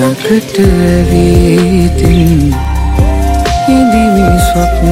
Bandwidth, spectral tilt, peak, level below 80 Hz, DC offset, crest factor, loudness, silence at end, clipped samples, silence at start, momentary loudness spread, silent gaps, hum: 16.5 kHz; -6.5 dB/octave; 0 dBFS; -14 dBFS; under 0.1%; 8 dB; -9 LUFS; 0 s; 0.2%; 0 s; 4 LU; none; none